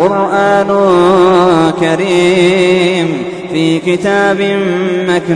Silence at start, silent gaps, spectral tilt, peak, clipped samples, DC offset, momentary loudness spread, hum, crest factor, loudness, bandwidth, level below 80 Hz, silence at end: 0 s; none; -6 dB/octave; 0 dBFS; under 0.1%; under 0.1%; 6 LU; none; 10 dB; -10 LUFS; 10.5 kHz; -46 dBFS; 0 s